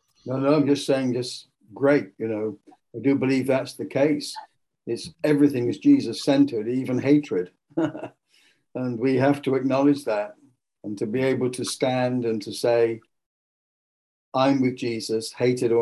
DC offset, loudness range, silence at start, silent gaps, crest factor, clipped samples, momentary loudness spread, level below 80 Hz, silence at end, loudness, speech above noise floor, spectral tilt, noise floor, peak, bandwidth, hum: under 0.1%; 3 LU; 0.25 s; 13.26-14.32 s; 18 dB; under 0.1%; 12 LU; -68 dBFS; 0 s; -23 LUFS; 40 dB; -6 dB/octave; -62 dBFS; -6 dBFS; 12.5 kHz; none